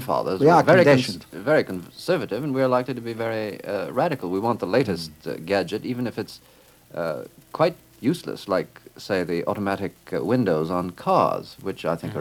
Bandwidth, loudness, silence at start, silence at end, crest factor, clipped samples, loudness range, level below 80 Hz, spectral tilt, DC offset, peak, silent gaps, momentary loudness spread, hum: 17.5 kHz; -23 LUFS; 0 s; 0 s; 20 dB; under 0.1%; 7 LU; -60 dBFS; -6.5 dB/octave; under 0.1%; -4 dBFS; none; 14 LU; none